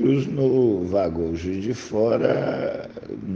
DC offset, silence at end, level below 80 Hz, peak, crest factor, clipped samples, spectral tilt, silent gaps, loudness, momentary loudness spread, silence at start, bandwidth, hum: under 0.1%; 0 s; -50 dBFS; -4 dBFS; 18 dB; under 0.1%; -7.5 dB/octave; none; -23 LUFS; 10 LU; 0 s; 7.4 kHz; none